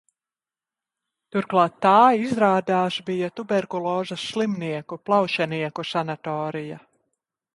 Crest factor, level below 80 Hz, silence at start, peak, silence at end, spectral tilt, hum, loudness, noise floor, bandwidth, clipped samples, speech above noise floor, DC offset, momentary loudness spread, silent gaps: 20 dB; -68 dBFS; 1.35 s; -4 dBFS; 0.75 s; -6 dB/octave; none; -23 LUFS; under -90 dBFS; 11.5 kHz; under 0.1%; over 68 dB; under 0.1%; 12 LU; none